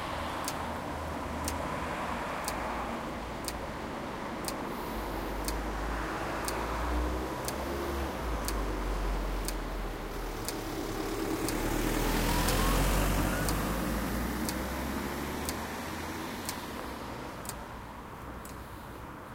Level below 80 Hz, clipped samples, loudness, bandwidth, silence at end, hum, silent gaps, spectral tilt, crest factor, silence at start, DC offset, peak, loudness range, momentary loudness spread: -38 dBFS; under 0.1%; -34 LUFS; 16.5 kHz; 0 s; none; none; -4.5 dB/octave; 20 dB; 0 s; under 0.1%; -14 dBFS; 7 LU; 10 LU